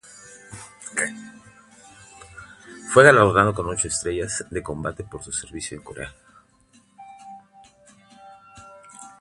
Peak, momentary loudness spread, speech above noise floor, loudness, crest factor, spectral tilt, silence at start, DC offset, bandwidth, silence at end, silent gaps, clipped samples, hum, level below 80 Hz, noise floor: 0 dBFS; 29 LU; 37 dB; -20 LUFS; 24 dB; -4 dB/octave; 0.5 s; under 0.1%; 11.5 kHz; 0.1 s; none; under 0.1%; none; -50 dBFS; -58 dBFS